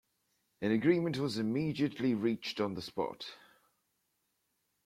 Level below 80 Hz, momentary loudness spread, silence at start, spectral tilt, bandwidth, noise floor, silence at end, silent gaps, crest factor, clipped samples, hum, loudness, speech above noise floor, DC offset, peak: -72 dBFS; 9 LU; 0.6 s; -6.5 dB/octave; 15 kHz; -80 dBFS; 1.5 s; none; 20 dB; under 0.1%; none; -34 LUFS; 47 dB; under 0.1%; -16 dBFS